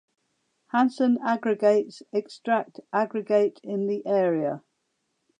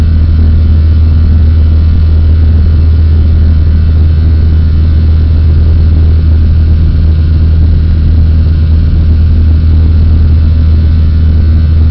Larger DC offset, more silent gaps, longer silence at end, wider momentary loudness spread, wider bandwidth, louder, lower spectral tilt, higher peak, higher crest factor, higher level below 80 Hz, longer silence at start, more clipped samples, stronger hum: second, under 0.1% vs 3%; neither; first, 0.8 s vs 0 s; first, 8 LU vs 1 LU; first, 9.8 kHz vs 4.9 kHz; second, -25 LUFS vs -7 LUFS; second, -7 dB/octave vs -11 dB/octave; second, -8 dBFS vs 0 dBFS; first, 16 dB vs 4 dB; second, -84 dBFS vs -8 dBFS; first, 0.75 s vs 0 s; neither; neither